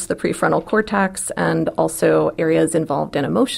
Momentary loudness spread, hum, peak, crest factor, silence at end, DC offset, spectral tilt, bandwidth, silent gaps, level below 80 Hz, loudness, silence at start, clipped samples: 4 LU; none; -2 dBFS; 16 dB; 0 s; under 0.1%; -5 dB/octave; 16 kHz; none; -50 dBFS; -19 LUFS; 0 s; under 0.1%